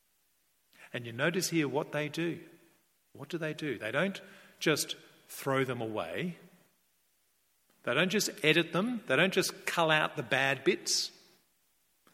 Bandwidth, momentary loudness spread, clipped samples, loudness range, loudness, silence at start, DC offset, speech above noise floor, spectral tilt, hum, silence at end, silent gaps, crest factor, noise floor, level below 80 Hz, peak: 16.5 kHz; 14 LU; under 0.1%; 7 LU; -31 LUFS; 0.8 s; under 0.1%; 42 dB; -3.5 dB/octave; none; 1.05 s; none; 24 dB; -74 dBFS; -78 dBFS; -10 dBFS